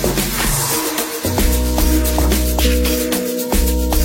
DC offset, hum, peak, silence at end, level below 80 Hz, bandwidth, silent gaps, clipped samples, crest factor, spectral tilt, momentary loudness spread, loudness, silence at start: under 0.1%; none; -2 dBFS; 0 s; -20 dBFS; 16.5 kHz; none; under 0.1%; 14 dB; -4 dB/octave; 3 LU; -17 LUFS; 0 s